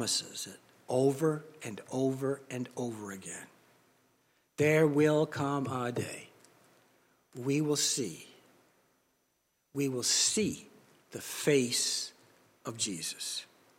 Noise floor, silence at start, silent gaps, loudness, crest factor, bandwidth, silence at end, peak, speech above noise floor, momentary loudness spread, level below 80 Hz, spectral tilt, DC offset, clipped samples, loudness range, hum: -77 dBFS; 0 s; none; -31 LUFS; 20 dB; 16.5 kHz; 0.35 s; -14 dBFS; 45 dB; 18 LU; -78 dBFS; -3.5 dB/octave; under 0.1%; under 0.1%; 5 LU; none